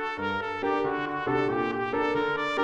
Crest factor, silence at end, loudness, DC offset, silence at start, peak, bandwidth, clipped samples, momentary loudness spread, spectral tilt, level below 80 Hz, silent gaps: 14 dB; 0 s; -28 LUFS; under 0.1%; 0 s; -14 dBFS; 8.8 kHz; under 0.1%; 3 LU; -6 dB/octave; -58 dBFS; none